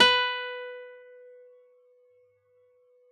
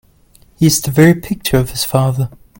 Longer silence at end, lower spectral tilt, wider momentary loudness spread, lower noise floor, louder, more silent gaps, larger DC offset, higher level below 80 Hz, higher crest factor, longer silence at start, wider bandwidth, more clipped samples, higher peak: first, 2.15 s vs 0.3 s; second, -1 dB/octave vs -5 dB/octave; first, 28 LU vs 7 LU; first, -65 dBFS vs -48 dBFS; second, -26 LUFS vs -14 LUFS; neither; neither; second, -90 dBFS vs -38 dBFS; first, 24 dB vs 14 dB; second, 0 s vs 0.6 s; second, 10.5 kHz vs 17 kHz; neither; second, -6 dBFS vs 0 dBFS